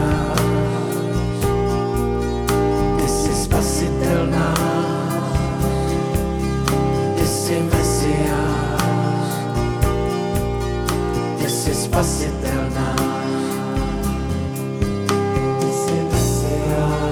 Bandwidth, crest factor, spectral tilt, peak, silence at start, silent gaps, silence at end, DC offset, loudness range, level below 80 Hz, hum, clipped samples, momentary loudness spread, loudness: over 20 kHz; 18 dB; -5.5 dB/octave; -2 dBFS; 0 s; none; 0 s; under 0.1%; 2 LU; -28 dBFS; none; under 0.1%; 4 LU; -20 LUFS